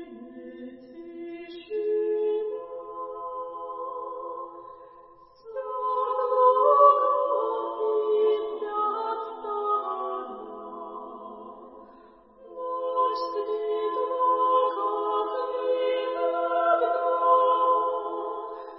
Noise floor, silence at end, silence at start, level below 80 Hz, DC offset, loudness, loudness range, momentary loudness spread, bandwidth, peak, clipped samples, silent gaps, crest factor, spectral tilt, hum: -53 dBFS; 0 s; 0 s; -70 dBFS; under 0.1%; -26 LUFS; 11 LU; 20 LU; 5.8 kHz; -6 dBFS; under 0.1%; none; 20 dB; -7 dB/octave; none